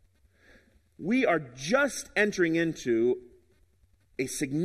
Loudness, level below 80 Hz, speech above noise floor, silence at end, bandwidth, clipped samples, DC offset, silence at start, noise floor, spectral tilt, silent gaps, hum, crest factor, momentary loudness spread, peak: -28 LUFS; -62 dBFS; 38 dB; 0 s; 14.5 kHz; under 0.1%; under 0.1%; 1 s; -66 dBFS; -4.5 dB/octave; none; none; 20 dB; 10 LU; -10 dBFS